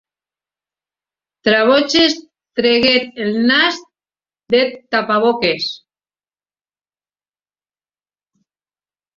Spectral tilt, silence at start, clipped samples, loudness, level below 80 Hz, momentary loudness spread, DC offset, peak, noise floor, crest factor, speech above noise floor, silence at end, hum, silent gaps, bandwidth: -3.5 dB/octave; 1.45 s; under 0.1%; -15 LUFS; -58 dBFS; 11 LU; under 0.1%; 0 dBFS; under -90 dBFS; 18 dB; over 75 dB; 3.4 s; 50 Hz at -55 dBFS; none; 7.6 kHz